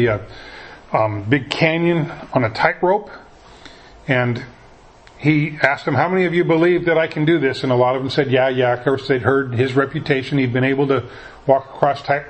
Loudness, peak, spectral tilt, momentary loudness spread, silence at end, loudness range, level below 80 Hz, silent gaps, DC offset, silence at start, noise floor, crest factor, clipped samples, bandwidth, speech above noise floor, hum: -18 LUFS; 0 dBFS; -7.5 dB/octave; 8 LU; 0 s; 4 LU; -50 dBFS; none; under 0.1%; 0 s; -45 dBFS; 18 dB; under 0.1%; 8.6 kHz; 27 dB; none